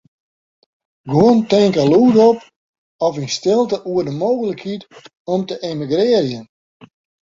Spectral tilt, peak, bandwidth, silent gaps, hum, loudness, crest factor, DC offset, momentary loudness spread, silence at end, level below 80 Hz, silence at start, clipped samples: -6.5 dB/octave; -2 dBFS; 7.8 kHz; 2.56-2.99 s, 5.20-5.25 s; none; -16 LUFS; 16 dB; under 0.1%; 12 LU; 0.85 s; -56 dBFS; 1.05 s; under 0.1%